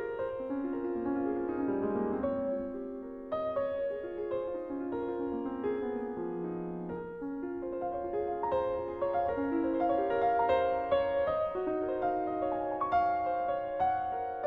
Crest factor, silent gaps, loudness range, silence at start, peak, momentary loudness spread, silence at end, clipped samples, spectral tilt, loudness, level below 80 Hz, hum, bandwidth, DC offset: 16 dB; none; 6 LU; 0 s; -18 dBFS; 8 LU; 0 s; under 0.1%; -9 dB/octave; -33 LUFS; -58 dBFS; none; 5.4 kHz; under 0.1%